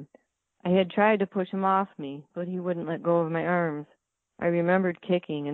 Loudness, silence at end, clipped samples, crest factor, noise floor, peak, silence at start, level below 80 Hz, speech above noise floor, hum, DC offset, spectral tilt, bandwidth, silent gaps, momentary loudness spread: -27 LUFS; 0 s; under 0.1%; 16 dB; -63 dBFS; -10 dBFS; 0 s; -70 dBFS; 36 dB; none; under 0.1%; -10 dB/octave; 4.1 kHz; none; 12 LU